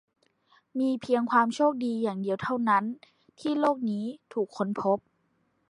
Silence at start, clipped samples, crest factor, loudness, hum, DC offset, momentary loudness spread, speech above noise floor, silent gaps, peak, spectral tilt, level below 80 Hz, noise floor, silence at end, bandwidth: 0.75 s; under 0.1%; 18 dB; -28 LUFS; none; under 0.1%; 10 LU; 45 dB; none; -10 dBFS; -6.5 dB/octave; -74 dBFS; -72 dBFS; 0.7 s; 10.5 kHz